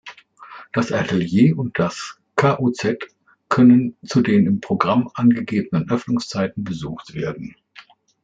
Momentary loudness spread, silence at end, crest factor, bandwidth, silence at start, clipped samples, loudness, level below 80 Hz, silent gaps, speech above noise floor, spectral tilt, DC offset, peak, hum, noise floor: 14 LU; 0.75 s; 18 dB; 7.8 kHz; 0.05 s; under 0.1%; -19 LUFS; -56 dBFS; none; 29 dB; -7 dB/octave; under 0.1%; -2 dBFS; none; -48 dBFS